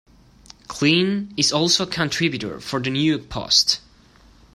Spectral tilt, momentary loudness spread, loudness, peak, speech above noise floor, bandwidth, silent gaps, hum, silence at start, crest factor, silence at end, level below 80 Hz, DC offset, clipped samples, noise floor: -3.5 dB/octave; 10 LU; -20 LUFS; -2 dBFS; 31 dB; 15 kHz; none; none; 0.7 s; 20 dB; 0.75 s; -50 dBFS; under 0.1%; under 0.1%; -51 dBFS